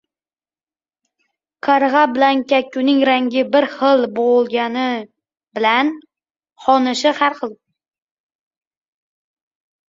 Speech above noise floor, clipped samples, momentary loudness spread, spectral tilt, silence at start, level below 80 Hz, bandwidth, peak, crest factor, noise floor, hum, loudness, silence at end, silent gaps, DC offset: over 74 dB; under 0.1%; 10 LU; -3.5 dB/octave; 1.65 s; -66 dBFS; 7.8 kHz; -2 dBFS; 18 dB; under -90 dBFS; none; -16 LUFS; 2.35 s; none; under 0.1%